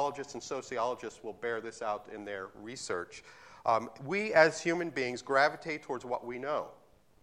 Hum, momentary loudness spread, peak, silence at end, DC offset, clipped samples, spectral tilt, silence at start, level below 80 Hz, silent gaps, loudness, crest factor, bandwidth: none; 15 LU; -10 dBFS; 0.45 s; under 0.1%; under 0.1%; -4 dB/octave; 0 s; -72 dBFS; none; -33 LUFS; 24 dB; 12 kHz